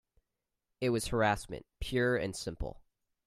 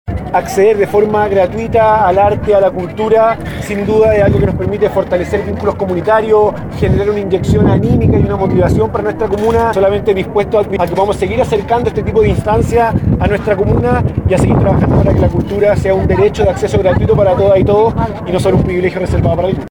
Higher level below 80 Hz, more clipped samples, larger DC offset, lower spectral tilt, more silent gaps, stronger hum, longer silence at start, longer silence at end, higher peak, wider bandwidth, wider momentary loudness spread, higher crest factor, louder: second, -50 dBFS vs -26 dBFS; neither; neither; second, -5 dB/octave vs -8 dB/octave; neither; neither; first, 0.8 s vs 0.05 s; first, 0.5 s vs 0 s; second, -14 dBFS vs -2 dBFS; second, 15 kHz vs 19 kHz; first, 13 LU vs 5 LU; first, 20 dB vs 10 dB; second, -33 LUFS vs -12 LUFS